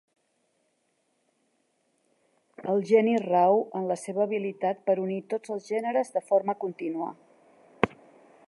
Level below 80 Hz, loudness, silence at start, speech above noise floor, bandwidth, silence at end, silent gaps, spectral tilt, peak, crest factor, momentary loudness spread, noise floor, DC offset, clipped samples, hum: -70 dBFS; -27 LUFS; 2.6 s; 47 dB; 11.5 kHz; 0.6 s; none; -6.5 dB/octave; -4 dBFS; 26 dB; 11 LU; -73 dBFS; under 0.1%; under 0.1%; none